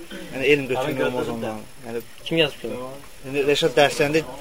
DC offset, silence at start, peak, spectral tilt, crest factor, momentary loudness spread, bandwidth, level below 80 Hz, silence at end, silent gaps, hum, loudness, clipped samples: 0.9%; 0 s; -2 dBFS; -4.5 dB/octave; 22 dB; 15 LU; 16 kHz; -52 dBFS; 0 s; none; none; -22 LUFS; under 0.1%